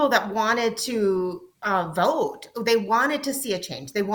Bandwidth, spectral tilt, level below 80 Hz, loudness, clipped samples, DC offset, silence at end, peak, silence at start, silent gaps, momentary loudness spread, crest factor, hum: 19.5 kHz; -3.5 dB/octave; -64 dBFS; -24 LUFS; under 0.1%; under 0.1%; 0 s; -4 dBFS; 0 s; none; 8 LU; 18 dB; none